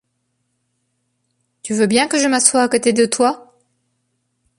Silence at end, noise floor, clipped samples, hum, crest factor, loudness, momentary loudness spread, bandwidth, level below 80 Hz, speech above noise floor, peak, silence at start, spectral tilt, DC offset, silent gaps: 1.2 s; -70 dBFS; under 0.1%; none; 20 dB; -15 LUFS; 11 LU; 15 kHz; -64 dBFS; 55 dB; 0 dBFS; 1.65 s; -2.5 dB/octave; under 0.1%; none